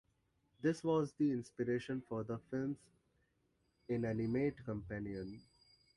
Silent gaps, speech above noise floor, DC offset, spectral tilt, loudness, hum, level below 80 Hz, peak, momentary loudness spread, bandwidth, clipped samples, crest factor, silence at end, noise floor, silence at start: none; 41 dB; under 0.1%; -7.5 dB/octave; -40 LUFS; none; -66 dBFS; -24 dBFS; 10 LU; 11.5 kHz; under 0.1%; 16 dB; 0.55 s; -79 dBFS; 0.6 s